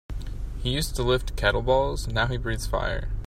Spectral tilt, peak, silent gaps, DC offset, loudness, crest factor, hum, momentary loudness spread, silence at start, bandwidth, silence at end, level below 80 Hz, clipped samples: -5 dB/octave; -8 dBFS; none; under 0.1%; -26 LUFS; 18 dB; none; 9 LU; 0.1 s; 16 kHz; 0 s; -30 dBFS; under 0.1%